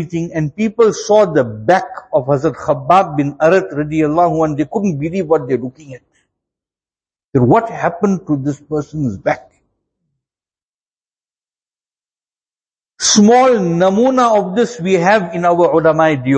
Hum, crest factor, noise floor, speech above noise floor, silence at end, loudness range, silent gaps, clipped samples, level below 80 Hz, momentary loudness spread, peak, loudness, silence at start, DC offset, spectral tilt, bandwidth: none; 14 dB; under -90 dBFS; over 77 dB; 0 s; 10 LU; 7.28-7.33 s, 10.63-10.79 s; under 0.1%; -50 dBFS; 8 LU; 0 dBFS; -14 LUFS; 0 s; under 0.1%; -5 dB/octave; 8.8 kHz